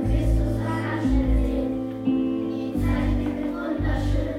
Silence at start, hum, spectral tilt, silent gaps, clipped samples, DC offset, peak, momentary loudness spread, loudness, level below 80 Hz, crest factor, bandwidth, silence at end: 0 s; none; -8 dB/octave; none; under 0.1%; under 0.1%; -10 dBFS; 4 LU; -25 LUFS; -28 dBFS; 12 dB; 12.5 kHz; 0 s